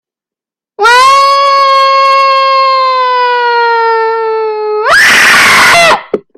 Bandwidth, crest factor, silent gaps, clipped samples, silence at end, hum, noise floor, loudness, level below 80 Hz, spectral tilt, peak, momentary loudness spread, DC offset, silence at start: 17 kHz; 8 dB; none; 0.8%; 0.15 s; none; -87 dBFS; -6 LUFS; -46 dBFS; -0.5 dB/octave; 0 dBFS; 9 LU; under 0.1%; 0.8 s